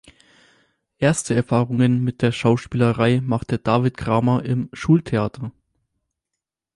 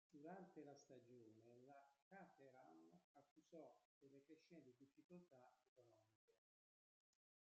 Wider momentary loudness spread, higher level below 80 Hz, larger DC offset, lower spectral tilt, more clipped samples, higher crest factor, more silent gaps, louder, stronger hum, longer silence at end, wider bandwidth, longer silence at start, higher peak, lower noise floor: about the same, 6 LU vs 8 LU; first, -48 dBFS vs under -90 dBFS; neither; about the same, -6.5 dB/octave vs -6 dB/octave; neither; about the same, 16 dB vs 20 dB; second, none vs 2.02-2.11 s, 3.04-3.15 s, 3.31-3.36 s, 3.85-4.01 s, 5.04-5.09 s, 5.68-5.76 s, 6.15-6.28 s; first, -20 LUFS vs -67 LUFS; neither; about the same, 1.25 s vs 1.15 s; first, 11.5 kHz vs 7.4 kHz; first, 1 s vs 0.1 s; first, -4 dBFS vs -48 dBFS; second, -83 dBFS vs under -90 dBFS